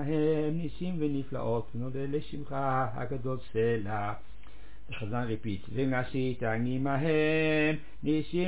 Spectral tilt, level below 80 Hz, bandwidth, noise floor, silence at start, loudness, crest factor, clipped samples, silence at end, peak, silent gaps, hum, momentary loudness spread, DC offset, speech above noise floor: -6 dB/octave; -52 dBFS; 4 kHz; -51 dBFS; 0 s; -31 LUFS; 14 dB; under 0.1%; 0 s; -16 dBFS; none; none; 9 LU; 2%; 21 dB